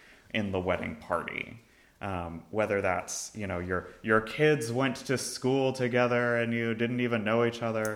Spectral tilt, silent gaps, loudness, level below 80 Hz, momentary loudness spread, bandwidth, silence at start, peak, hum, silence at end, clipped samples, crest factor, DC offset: -5 dB/octave; none; -30 LUFS; -60 dBFS; 10 LU; 19.5 kHz; 0.35 s; -10 dBFS; none; 0 s; under 0.1%; 20 dB; under 0.1%